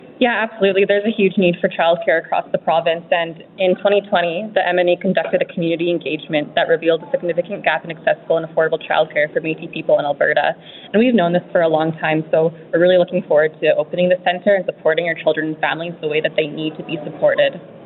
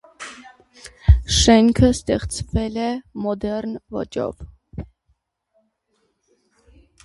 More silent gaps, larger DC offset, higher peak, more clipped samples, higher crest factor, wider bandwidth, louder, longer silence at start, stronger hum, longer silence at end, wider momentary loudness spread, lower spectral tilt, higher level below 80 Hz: neither; neither; about the same, 0 dBFS vs 0 dBFS; neither; about the same, 18 dB vs 20 dB; second, 4.3 kHz vs 11.5 kHz; first, -17 LUFS vs -20 LUFS; second, 0 s vs 0.2 s; neither; second, 0 s vs 2.2 s; second, 6 LU vs 23 LU; first, -10.5 dB/octave vs -5 dB/octave; second, -66 dBFS vs -28 dBFS